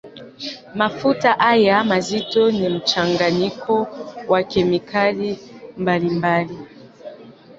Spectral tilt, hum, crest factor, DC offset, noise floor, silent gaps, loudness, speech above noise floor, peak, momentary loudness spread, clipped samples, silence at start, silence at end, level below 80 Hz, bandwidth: -5.5 dB/octave; none; 18 dB; under 0.1%; -41 dBFS; none; -19 LUFS; 23 dB; -2 dBFS; 17 LU; under 0.1%; 0.05 s; 0.05 s; -54 dBFS; 8 kHz